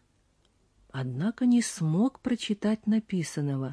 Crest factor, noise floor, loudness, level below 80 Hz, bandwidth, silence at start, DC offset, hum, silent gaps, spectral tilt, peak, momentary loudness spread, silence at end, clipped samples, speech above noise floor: 12 dB; -68 dBFS; -28 LUFS; -66 dBFS; 11 kHz; 0.95 s; under 0.1%; none; none; -6 dB/octave; -16 dBFS; 8 LU; 0 s; under 0.1%; 40 dB